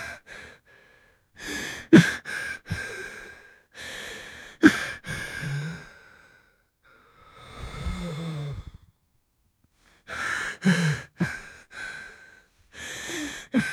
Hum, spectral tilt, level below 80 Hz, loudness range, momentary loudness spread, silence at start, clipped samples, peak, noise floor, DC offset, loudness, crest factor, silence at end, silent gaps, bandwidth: none; -5.5 dB/octave; -50 dBFS; 13 LU; 23 LU; 0 s; under 0.1%; -2 dBFS; -69 dBFS; under 0.1%; -26 LUFS; 28 dB; 0 s; none; 15 kHz